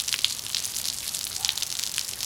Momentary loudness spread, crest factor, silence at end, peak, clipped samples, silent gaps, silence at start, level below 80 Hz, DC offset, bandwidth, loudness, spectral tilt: 3 LU; 30 dB; 0 s; 0 dBFS; under 0.1%; none; 0 s; -58 dBFS; under 0.1%; 18 kHz; -27 LUFS; 1.5 dB/octave